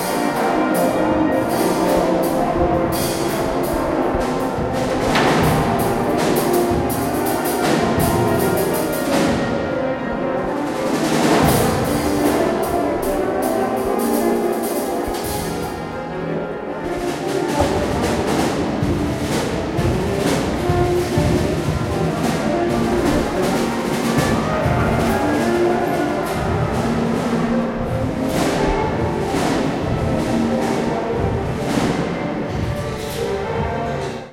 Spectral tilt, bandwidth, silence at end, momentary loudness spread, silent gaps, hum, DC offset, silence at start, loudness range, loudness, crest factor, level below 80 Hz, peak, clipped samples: -5.5 dB/octave; 16.5 kHz; 0 s; 5 LU; none; none; under 0.1%; 0 s; 3 LU; -19 LUFS; 16 dB; -36 dBFS; -4 dBFS; under 0.1%